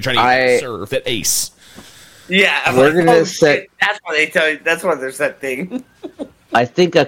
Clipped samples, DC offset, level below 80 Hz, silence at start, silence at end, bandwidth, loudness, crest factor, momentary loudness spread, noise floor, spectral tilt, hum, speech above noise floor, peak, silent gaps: under 0.1%; under 0.1%; -52 dBFS; 0 s; 0 s; 17 kHz; -15 LUFS; 16 dB; 13 LU; -42 dBFS; -3.5 dB/octave; none; 26 dB; 0 dBFS; none